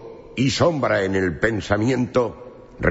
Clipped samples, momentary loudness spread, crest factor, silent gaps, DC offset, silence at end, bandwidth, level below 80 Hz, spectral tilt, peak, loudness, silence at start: under 0.1%; 8 LU; 18 dB; none; under 0.1%; 0 s; 8 kHz; -44 dBFS; -5.5 dB/octave; -4 dBFS; -21 LUFS; 0 s